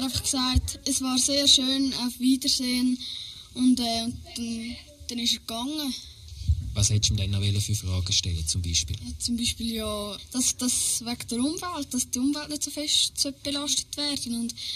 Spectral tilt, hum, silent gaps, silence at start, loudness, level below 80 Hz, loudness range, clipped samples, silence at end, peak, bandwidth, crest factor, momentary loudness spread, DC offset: -3 dB/octave; none; none; 0 s; -25 LUFS; -40 dBFS; 5 LU; under 0.1%; 0 s; -8 dBFS; 14.5 kHz; 20 dB; 11 LU; under 0.1%